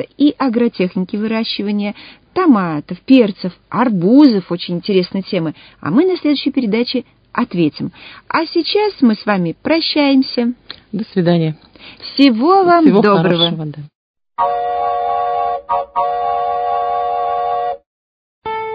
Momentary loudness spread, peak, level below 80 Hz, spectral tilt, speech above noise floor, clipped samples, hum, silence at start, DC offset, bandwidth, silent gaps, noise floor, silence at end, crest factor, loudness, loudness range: 14 LU; 0 dBFS; -54 dBFS; -9 dB/octave; over 76 dB; under 0.1%; none; 0 s; under 0.1%; 5.2 kHz; 13.95-14.14 s, 17.86-18.42 s; under -90 dBFS; 0 s; 16 dB; -15 LUFS; 5 LU